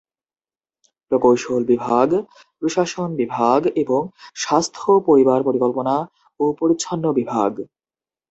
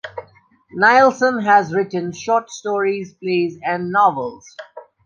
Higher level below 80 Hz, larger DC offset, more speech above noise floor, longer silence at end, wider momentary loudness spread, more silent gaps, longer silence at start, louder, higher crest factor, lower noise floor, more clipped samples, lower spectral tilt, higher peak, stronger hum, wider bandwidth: about the same, -62 dBFS vs -64 dBFS; neither; first, over 72 dB vs 34 dB; first, 0.65 s vs 0.25 s; second, 8 LU vs 21 LU; neither; first, 1.1 s vs 0.05 s; about the same, -19 LUFS vs -17 LUFS; about the same, 18 dB vs 16 dB; first, under -90 dBFS vs -52 dBFS; neither; about the same, -5.5 dB/octave vs -5 dB/octave; about the same, -2 dBFS vs -2 dBFS; neither; about the same, 8.2 kHz vs 7.6 kHz